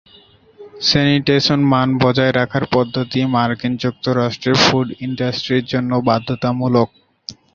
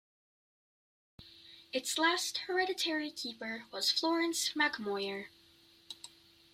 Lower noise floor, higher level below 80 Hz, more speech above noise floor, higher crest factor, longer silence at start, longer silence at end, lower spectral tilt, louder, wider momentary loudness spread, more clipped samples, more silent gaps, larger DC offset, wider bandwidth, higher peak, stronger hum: second, -48 dBFS vs -64 dBFS; first, -48 dBFS vs -78 dBFS; about the same, 32 dB vs 29 dB; about the same, 18 dB vs 20 dB; second, 0.6 s vs 1.2 s; second, 0.2 s vs 0.45 s; first, -5.5 dB/octave vs -1 dB/octave; first, -16 LUFS vs -33 LUFS; second, 7 LU vs 21 LU; neither; neither; neither; second, 7.4 kHz vs 16 kHz; first, 0 dBFS vs -16 dBFS; neither